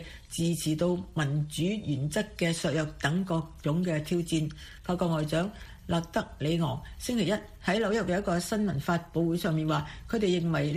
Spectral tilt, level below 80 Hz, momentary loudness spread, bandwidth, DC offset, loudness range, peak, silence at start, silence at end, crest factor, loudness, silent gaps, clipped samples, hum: -6 dB/octave; -50 dBFS; 5 LU; 15.5 kHz; under 0.1%; 2 LU; -14 dBFS; 0 s; 0 s; 16 dB; -30 LUFS; none; under 0.1%; none